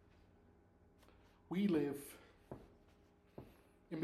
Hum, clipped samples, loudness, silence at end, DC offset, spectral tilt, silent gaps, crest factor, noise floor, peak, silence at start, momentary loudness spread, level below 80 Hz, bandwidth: none; under 0.1%; -40 LUFS; 0 s; under 0.1%; -7 dB/octave; none; 18 dB; -69 dBFS; -26 dBFS; 1.5 s; 24 LU; -72 dBFS; 14.5 kHz